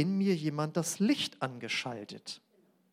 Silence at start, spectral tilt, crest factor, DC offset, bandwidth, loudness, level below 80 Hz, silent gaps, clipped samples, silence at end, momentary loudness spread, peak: 0 s; -4.5 dB/octave; 18 dB; under 0.1%; 16 kHz; -33 LUFS; -82 dBFS; none; under 0.1%; 0.55 s; 14 LU; -16 dBFS